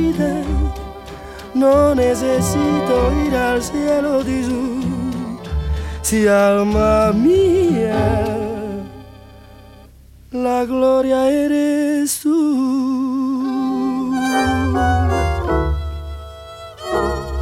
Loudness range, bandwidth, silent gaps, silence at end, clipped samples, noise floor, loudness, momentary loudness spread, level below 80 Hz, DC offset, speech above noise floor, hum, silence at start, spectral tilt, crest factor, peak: 4 LU; 16.5 kHz; none; 0 s; under 0.1%; -43 dBFS; -17 LUFS; 14 LU; -28 dBFS; under 0.1%; 27 dB; none; 0 s; -6 dB/octave; 14 dB; -4 dBFS